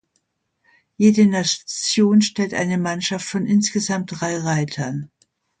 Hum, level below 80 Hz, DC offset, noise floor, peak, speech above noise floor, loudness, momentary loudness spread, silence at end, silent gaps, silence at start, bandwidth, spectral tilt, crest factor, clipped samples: none; -62 dBFS; under 0.1%; -71 dBFS; -2 dBFS; 52 dB; -19 LUFS; 9 LU; 0.55 s; none; 1 s; 9.4 kHz; -4.5 dB/octave; 18 dB; under 0.1%